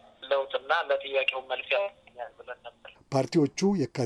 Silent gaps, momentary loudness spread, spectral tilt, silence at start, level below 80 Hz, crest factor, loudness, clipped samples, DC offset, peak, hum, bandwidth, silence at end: none; 17 LU; -5.5 dB/octave; 0.2 s; -68 dBFS; 18 dB; -28 LUFS; under 0.1%; under 0.1%; -12 dBFS; none; 11 kHz; 0 s